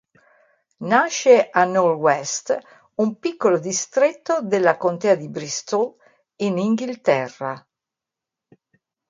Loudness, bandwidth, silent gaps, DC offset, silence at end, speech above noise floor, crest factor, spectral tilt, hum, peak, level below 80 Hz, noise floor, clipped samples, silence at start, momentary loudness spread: -20 LUFS; 9.4 kHz; none; under 0.1%; 1.5 s; 67 dB; 20 dB; -4 dB/octave; none; -2 dBFS; -72 dBFS; -86 dBFS; under 0.1%; 0.8 s; 12 LU